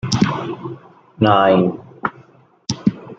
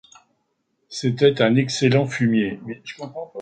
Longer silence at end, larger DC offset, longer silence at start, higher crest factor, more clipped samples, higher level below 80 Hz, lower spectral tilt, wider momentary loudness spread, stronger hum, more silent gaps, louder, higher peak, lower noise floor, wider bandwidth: about the same, 0.05 s vs 0 s; neither; second, 0.05 s vs 0.9 s; about the same, 18 dB vs 18 dB; neither; first, -50 dBFS vs -60 dBFS; about the same, -6 dB/octave vs -6 dB/octave; about the same, 17 LU vs 16 LU; neither; neither; about the same, -18 LUFS vs -19 LUFS; first, 0 dBFS vs -4 dBFS; second, -50 dBFS vs -71 dBFS; about the same, 9 kHz vs 9.2 kHz